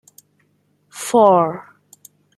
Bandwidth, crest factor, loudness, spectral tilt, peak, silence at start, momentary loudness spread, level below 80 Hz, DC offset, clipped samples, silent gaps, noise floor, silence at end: 15.5 kHz; 18 dB; -15 LUFS; -5.5 dB/octave; -2 dBFS; 0.95 s; 23 LU; -70 dBFS; under 0.1%; under 0.1%; none; -62 dBFS; 0.75 s